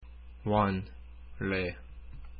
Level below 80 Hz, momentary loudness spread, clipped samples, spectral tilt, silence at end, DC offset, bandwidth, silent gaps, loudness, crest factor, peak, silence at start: -48 dBFS; 23 LU; under 0.1%; -10.5 dB/octave; 0 s; under 0.1%; 5.2 kHz; none; -32 LUFS; 20 dB; -14 dBFS; 0 s